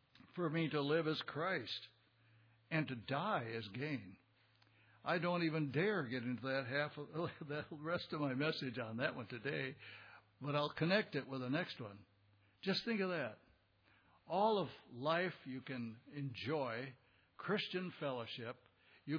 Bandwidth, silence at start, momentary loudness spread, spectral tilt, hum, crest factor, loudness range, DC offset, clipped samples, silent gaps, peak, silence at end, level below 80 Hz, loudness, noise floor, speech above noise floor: 5.4 kHz; 0.25 s; 12 LU; -4 dB/octave; none; 20 dB; 3 LU; under 0.1%; under 0.1%; none; -22 dBFS; 0 s; -82 dBFS; -41 LUFS; -73 dBFS; 32 dB